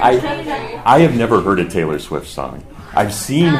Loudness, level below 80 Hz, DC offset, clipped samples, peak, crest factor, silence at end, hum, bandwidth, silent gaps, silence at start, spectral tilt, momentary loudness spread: -16 LUFS; -38 dBFS; under 0.1%; under 0.1%; 0 dBFS; 16 dB; 0 s; none; 15.5 kHz; none; 0 s; -6 dB/octave; 15 LU